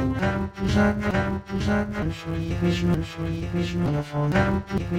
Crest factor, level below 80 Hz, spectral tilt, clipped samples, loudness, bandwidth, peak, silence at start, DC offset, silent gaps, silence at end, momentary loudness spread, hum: 16 dB; -36 dBFS; -7 dB/octave; under 0.1%; -25 LUFS; 15 kHz; -8 dBFS; 0 s; under 0.1%; none; 0 s; 7 LU; none